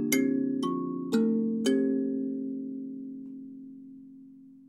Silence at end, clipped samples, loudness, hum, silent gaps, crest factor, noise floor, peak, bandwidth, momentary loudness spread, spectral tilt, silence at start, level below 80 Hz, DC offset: 0.05 s; under 0.1%; -29 LUFS; none; none; 20 dB; -51 dBFS; -10 dBFS; 15.5 kHz; 20 LU; -5 dB/octave; 0 s; -82 dBFS; under 0.1%